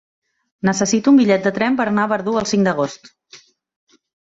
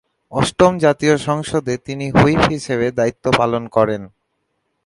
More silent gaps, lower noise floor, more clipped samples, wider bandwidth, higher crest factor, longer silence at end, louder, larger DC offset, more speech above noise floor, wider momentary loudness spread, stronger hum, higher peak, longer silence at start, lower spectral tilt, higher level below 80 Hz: neither; second, -48 dBFS vs -70 dBFS; neither; second, 8 kHz vs 11.5 kHz; about the same, 14 dB vs 18 dB; first, 0.95 s vs 0.8 s; about the same, -17 LUFS vs -17 LUFS; neither; second, 31 dB vs 54 dB; about the same, 8 LU vs 8 LU; neither; second, -4 dBFS vs 0 dBFS; first, 0.65 s vs 0.3 s; about the same, -5 dB/octave vs -5.5 dB/octave; second, -58 dBFS vs -40 dBFS